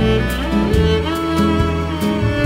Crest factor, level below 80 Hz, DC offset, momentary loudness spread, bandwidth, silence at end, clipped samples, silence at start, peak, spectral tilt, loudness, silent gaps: 12 dB; -24 dBFS; under 0.1%; 4 LU; 16 kHz; 0 s; under 0.1%; 0 s; -4 dBFS; -6.5 dB/octave; -17 LUFS; none